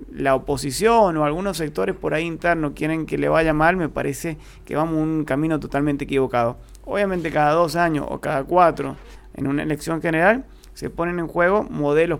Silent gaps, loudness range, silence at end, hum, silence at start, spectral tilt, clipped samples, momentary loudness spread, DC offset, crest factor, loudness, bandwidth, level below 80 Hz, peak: none; 2 LU; 0 s; none; 0 s; -6 dB/octave; under 0.1%; 11 LU; under 0.1%; 18 dB; -21 LUFS; 17 kHz; -42 dBFS; -2 dBFS